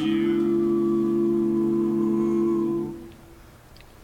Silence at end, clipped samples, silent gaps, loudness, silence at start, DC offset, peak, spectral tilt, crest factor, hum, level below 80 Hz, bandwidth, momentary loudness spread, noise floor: 0 s; under 0.1%; none; -23 LUFS; 0 s; under 0.1%; -14 dBFS; -8 dB/octave; 10 dB; none; -54 dBFS; 7.2 kHz; 5 LU; -48 dBFS